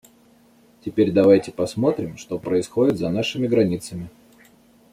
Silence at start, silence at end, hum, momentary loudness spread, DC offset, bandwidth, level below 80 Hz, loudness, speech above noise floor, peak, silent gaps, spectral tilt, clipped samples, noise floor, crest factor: 0.85 s; 0.85 s; none; 16 LU; under 0.1%; 15 kHz; -58 dBFS; -21 LUFS; 34 dB; -4 dBFS; none; -6.5 dB/octave; under 0.1%; -54 dBFS; 18 dB